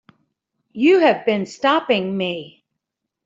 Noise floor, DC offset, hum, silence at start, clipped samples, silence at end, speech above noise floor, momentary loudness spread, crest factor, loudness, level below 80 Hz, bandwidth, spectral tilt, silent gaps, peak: -80 dBFS; under 0.1%; none; 0.75 s; under 0.1%; 0.8 s; 63 dB; 12 LU; 18 dB; -18 LUFS; -68 dBFS; 7.8 kHz; -5.5 dB/octave; none; -2 dBFS